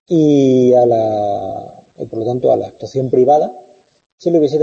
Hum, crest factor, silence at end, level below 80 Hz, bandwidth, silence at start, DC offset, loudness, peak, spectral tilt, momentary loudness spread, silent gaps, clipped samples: none; 12 dB; 0 s; -58 dBFS; 7.4 kHz; 0.1 s; under 0.1%; -14 LUFS; -2 dBFS; -8.5 dB/octave; 14 LU; 4.06-4.18 s; under 0.1%